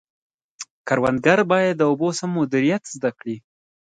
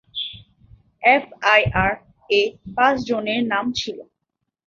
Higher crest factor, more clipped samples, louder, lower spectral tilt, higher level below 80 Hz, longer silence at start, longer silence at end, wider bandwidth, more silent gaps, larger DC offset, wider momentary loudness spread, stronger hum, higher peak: about the same, 20 dB vs 20 dB; neither; about the same, -20 LUFS vs -19 LUFS; about the same, -5.5 dB/octave vs -4.5 dB/octave; second, -60 dBFS vs -46 dBFS; first, 0.6 s vs 0.15 s; second, 0.4 s vs 0.65 s; first, 9.4 kHz vs 7.6 kHz; first, 0.71-0.85 s vs none; neither; first, 17 LU vs 14 LU; neither; about the same, -2 dBFS vs -2 dBFS